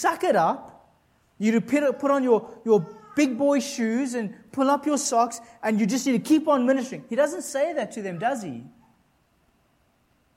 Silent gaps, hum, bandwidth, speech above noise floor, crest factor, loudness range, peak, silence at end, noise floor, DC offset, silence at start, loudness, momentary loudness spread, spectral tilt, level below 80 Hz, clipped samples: none; none; 16 kHz; 42 dB; 18 dB; 4 LU; -8 dBFS; 1.7 s; -65 dBFS; under 0.1%; 0 s; -24 LUFS; 9 LU; -4.5 dB/octave; -72 dBFS; under 0.1%